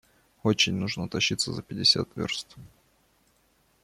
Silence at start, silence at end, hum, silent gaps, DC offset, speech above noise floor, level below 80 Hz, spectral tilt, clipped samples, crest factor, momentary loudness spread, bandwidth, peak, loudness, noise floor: 0.45 s; 1.15 s; none; none; under 0.1%; 39 dB; -60 dBFS; -3.5 dB/octave; under 0.1%; 22 dB; 10 LU; 15.5 kHz; -8 dBFS; -26 LUFS; -67 dBFS